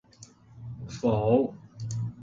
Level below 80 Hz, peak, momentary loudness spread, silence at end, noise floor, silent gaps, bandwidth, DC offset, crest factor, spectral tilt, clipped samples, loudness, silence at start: -54 dBFS; -10 dBFS; 19 LU; 0 s; -53 dBFS; none; 7.8 kHz; under 0.1%; 20 dB; -8 dB/octave; under 0.1%; -27 LUFS; 0.2 s